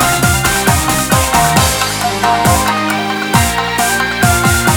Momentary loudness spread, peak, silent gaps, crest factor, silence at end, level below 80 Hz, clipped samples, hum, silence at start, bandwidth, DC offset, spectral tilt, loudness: 4 LU; 0 dBFS; none; 12 dB; 0 s; -26 dBFS; under 0.1%; none; 0 s; over 20 kHz; under 0.1%; -3.5 dB/octave; -12 LUFS